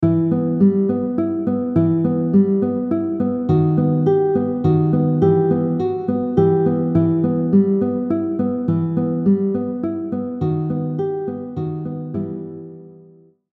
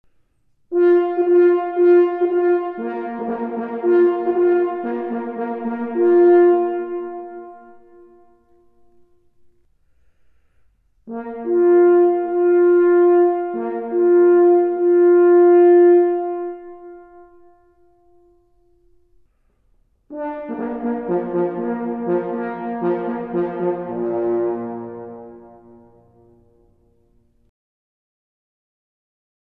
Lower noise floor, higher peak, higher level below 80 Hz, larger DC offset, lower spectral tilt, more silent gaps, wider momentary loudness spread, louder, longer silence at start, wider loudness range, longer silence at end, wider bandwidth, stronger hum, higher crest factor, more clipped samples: second, -49 dBFS vs -62 dBFS; about the same, -4 dBFS vs -6 dBFS; first, -54 dBFS vs -64 dBFS; neither; first, -12.5 dB/octave vs -10.5 dB/octave; neither; second, 10 LU vs 17 LU; about the same, -19 LUFS vs -17 LUFS; second, 0 s vs 0.7 s; second, 6 LU vs 17 LU; second, 0.6 s vs 4.05 s; first, 4 kHz vs 3.3 kHz; neither; about the same, 14 dB vs 14 dB; neither